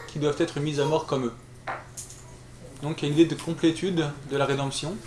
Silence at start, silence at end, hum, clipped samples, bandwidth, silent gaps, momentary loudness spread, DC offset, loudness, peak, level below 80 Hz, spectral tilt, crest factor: 0 s; 0 s; none; under 0.1%; 12 kHz; none; 18 LU; under 0.1%; -27 LUFS; -8 dBFS; -54 dBFS; -5.5 dB/octave; 20 dB